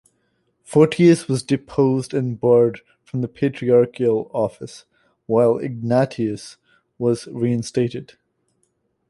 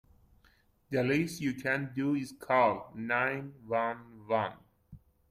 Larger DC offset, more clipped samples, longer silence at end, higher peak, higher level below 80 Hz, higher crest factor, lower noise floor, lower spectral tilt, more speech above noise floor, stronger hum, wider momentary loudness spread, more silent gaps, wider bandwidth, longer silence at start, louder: neither; neither; first, 1.05 s vs 0.35 s; first, -2 dBFS vs -14 dBFS; first, -58 dBFS vs -66 dBFS; about the same, 18 dB vs 20 dB; about the same, -69 dBFS vs -67 dBFS; about the same, -7 dB/octave vs -6 dB/octave; first, 50 dB vs 35 dB; neither; first, 12 LU vs 9 LU; neither; second, 11.5 kHz vs 15.5 kHz; second, 0.7 s vs 0.9 s; first, -20 LUFS vs -32 LUFS